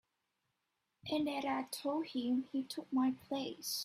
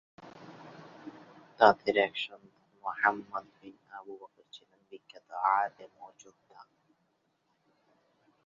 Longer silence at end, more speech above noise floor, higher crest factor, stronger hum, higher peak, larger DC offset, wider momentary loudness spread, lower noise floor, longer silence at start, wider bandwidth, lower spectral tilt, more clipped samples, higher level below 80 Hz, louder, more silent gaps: second, 0 s vs 1.85 s; about the same, 48 dB vs 46 dB; second, 14 dB vs 28 dB; neither; second, -24 dBFS vs -6 dBFS; neither; second, 6 LU vs 28 LU; first, -86 dBFS vs -76 dBFS; first, 1.05 s vs 0.25 s; first, 16 kHz vs 7.2 kHz; first, -3.5 dB/octave vs -1 dB/octave; neither; about the same, -80 dBFS vs -78 dBFS; second, -38 LUFS vs -29 LUFS; neither